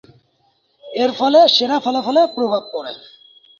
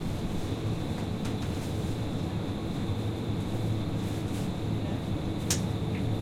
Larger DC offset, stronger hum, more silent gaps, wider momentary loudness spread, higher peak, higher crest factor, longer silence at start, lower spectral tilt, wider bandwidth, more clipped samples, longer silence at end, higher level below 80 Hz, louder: neither; neither; neither; first, 17 LU vs 3 LU; first, -2 dBFS vs -10 dBFS; about the same, 16 dB vs 20 dB; first, 0.85 s vs 0 s; second, -4 dB/octave vs -6 dB/octave; second, 7.4 kHz vs 16.5 kHz; neither; first, 0.6 s vs 0 s; second, -68 dBFS vs -44 dBFS; first, -15 LUFS vs -32 LUFS